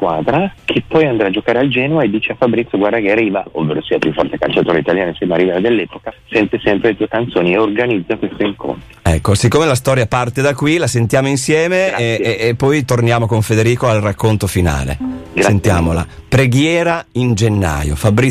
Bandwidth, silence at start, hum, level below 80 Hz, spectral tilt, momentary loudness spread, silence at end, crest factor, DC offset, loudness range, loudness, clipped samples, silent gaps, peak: 15 kHz; 0 s; none; -32 dBFS; -6 dB/octave; 5 LU; 0 s; 12 dB; under 0.1%; 2 LU; -14 LUFS; under 0.1%; none; -2 dBFS